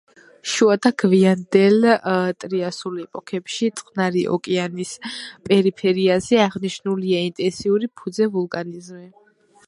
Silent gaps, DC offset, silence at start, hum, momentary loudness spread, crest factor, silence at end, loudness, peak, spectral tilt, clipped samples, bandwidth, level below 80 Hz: none; under 0.1%; 0.45 s; none; 13 LU; 20 dB; 0.6 s; -20 LUFS; 0 dBFS; -5.5 dB/octave; under 0.1%; 11.5 kHz; -62 dBFS